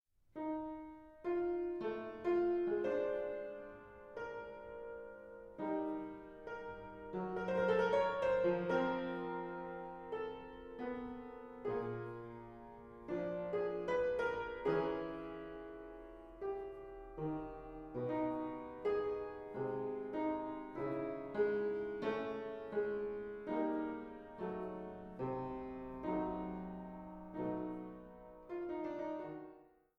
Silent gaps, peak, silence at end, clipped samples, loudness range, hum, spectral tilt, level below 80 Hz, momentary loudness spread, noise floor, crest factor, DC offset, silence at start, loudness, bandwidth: none; -22 dBFS; 0.3 s; under 0.1%; 8 LU; none; -8 dB/octave; -66 dBFS; 15 LU; -62 dBFS; 18 dB; under 0.1%; 0.35 s; -41 LUFS; 7.6 kHz